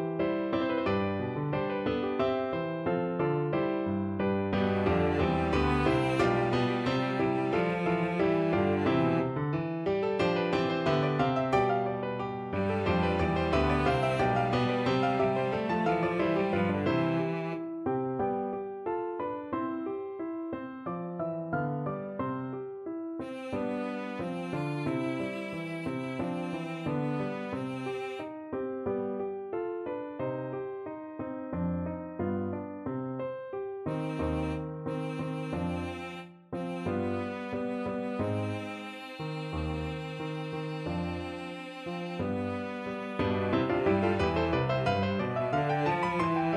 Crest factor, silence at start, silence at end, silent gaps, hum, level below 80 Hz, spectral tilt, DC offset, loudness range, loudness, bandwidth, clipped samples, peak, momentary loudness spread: 18 dB; 0 s; 0 s; none; none; -50 dBFS; -7.5 dB/octave; under 0.1%; 8 LU; -31 LUFS; 11 kHz; under 0.1%; -14 dBFS; 10 LU